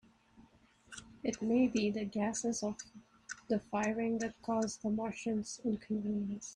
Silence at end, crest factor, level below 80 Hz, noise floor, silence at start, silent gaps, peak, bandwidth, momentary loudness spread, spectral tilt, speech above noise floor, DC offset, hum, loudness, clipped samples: 0 s; 16 dB; -68 dBFS; -65 dBFS; 0.4 s; none; -20 dBFS; 11 kHz; 17 LU; -5 dB/octave; 30 dB; under 0.1%; none; -36 LUFS; under 0.1%